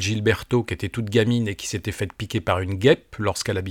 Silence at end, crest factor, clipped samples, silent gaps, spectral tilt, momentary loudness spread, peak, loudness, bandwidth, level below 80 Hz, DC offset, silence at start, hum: 0 s; 20 dB; under 0.1%; none; -5.5 dB/octave; 9 LU; -4 dBFS; -23 LUFS; 17 kHz; -48 dBFS; under 0.1%; 0 s; none